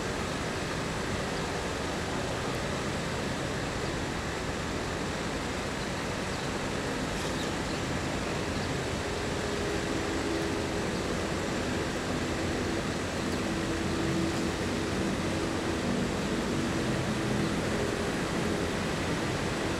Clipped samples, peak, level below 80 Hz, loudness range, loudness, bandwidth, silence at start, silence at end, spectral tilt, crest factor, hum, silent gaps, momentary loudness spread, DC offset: under 0.1%; -18 dBFS; -44 dBFS; 2 LU; -31 LUFS; 16 kHz; 0 s; 0 s; -4.5 dB/octave; 14 dB; none; none; 3 LU; under 0.1%